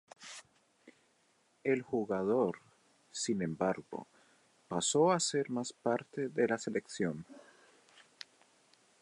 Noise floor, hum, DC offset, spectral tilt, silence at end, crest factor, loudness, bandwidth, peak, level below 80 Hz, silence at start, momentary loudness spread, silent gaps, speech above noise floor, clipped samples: -72 dBFS; none; under 0.1%; -4 dB/octave; 1.65 s; 20 dB; -34 LUFS; 11.5 kHz; -16 dBFS; -76 dBFS; 0.2 s; 21 LU; none; 39 dB; under 0.1%